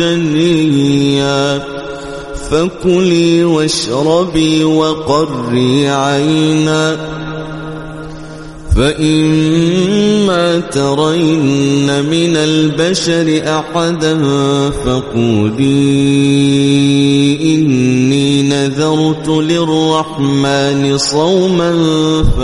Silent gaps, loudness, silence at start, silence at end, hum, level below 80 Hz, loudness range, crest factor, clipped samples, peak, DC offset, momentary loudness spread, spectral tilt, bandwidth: none; -12 LUFS; 0 s; 0 s; none; -30 dBFS; 3 LU; 12 dB; under 0.1%; 0 dBFS; under 0.1%; 7 LU; -5.5 dB/octave; 11.5 kHz